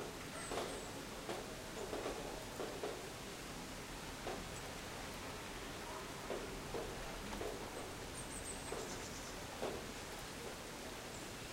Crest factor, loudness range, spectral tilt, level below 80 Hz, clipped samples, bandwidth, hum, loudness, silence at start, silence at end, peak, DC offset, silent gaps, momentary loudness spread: 18 dB; 1 LU; -3.5 dB/octave; -58 dBFS; under 0.1%; 16 kHz; none; -46 LUFS; 0 s; 0 s; -28 dBFS; under 0.1%; none; 4 LU